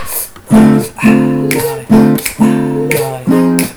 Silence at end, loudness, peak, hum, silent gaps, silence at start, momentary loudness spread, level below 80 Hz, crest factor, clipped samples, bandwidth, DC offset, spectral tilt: 0 s; -11 LUFS; 0 dBFS; none; none; 0 s; 6 LU; -38 dBFS; 10 dB; 0.1%; over 20 kHz; under 0.1%; -6 dB/octave